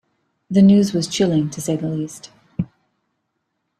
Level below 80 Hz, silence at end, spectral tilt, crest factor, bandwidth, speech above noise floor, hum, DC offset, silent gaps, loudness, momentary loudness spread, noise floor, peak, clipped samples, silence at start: -54 dBFS; 1.15 s; -6.5 dB/octave; 16 dB; 13 kHz; 57 dB; none; under 0.1%; none; -18 LUFS; 18 LU; -74 dBFS; -4 dBFS; under 0.1%; 0.5 s